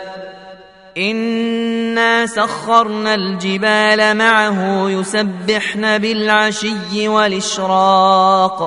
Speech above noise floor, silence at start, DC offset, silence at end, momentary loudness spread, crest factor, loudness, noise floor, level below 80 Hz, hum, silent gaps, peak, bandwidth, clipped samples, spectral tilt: 24 dB; 0 s; under 0.1%; 0 s; 8 LU; 14 dB; -14 LUFS; -39 dBFS; -58 dBFS; none; none; 0 dBFS; 11 kHz; under 0.1%; -4 dB/octave